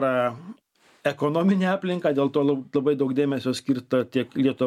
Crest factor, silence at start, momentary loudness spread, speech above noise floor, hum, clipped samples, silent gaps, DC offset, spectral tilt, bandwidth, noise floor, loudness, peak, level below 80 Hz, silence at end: 16 dB; 0 s; 7 LU; 37 dB; none; under 0.1%; none; under 0.1%; -7 dB/octave; 13.5 kHz; -60 dBFS; -24 LUFS; -8 dBFS; -70 dBFS; 0 s